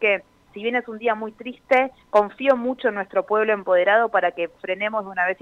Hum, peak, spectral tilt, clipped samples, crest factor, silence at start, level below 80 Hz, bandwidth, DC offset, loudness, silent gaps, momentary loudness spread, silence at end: none; -4 dBFS; -5.5 dB/octave; under 0.1%; 16 dB; 0 s; -64 dBFS; 7 kHz; under 0.1%; -22 LUFS; none; 9 LU; 0.1 s